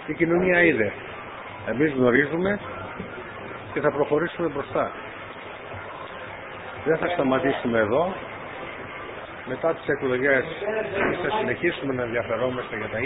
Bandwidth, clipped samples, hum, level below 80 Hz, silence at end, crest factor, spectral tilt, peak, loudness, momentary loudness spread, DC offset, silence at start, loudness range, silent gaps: 4 kHz; under 0.1%; none; -54 dBFS; 0 s; 22 dB; -10.5 dB/octave; -4 dBFS; -24 LUFS; 16 LU; under 0.1%; 0 s; 5 LU; none